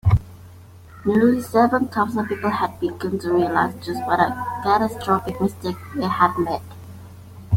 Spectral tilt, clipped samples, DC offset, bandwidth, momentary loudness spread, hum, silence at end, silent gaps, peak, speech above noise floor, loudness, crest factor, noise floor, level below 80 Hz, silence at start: -7.5 dB/octave; under 0.1%; under 0.1%; 16.5 kHz; 12 LU; none; 0 s; none; -2 dBFS; 22 dB; -21 LUFS; 18 dB; -43 dBFS; -42 dBFS; 0.05 s